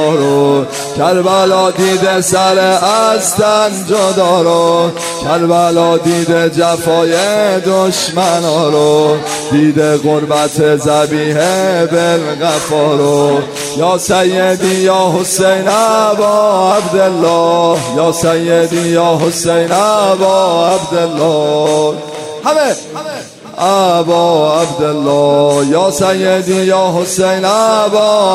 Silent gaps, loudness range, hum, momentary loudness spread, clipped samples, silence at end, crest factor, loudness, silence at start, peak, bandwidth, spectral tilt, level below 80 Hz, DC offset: none; 2 LU; none; 4 LU; under 0.1%; 0 s; 10 dB; -11 LUFS; 0 s; 0 dBFS; 16 kHz; -4.5 dB/octave; -50 dBFS; under 0.1%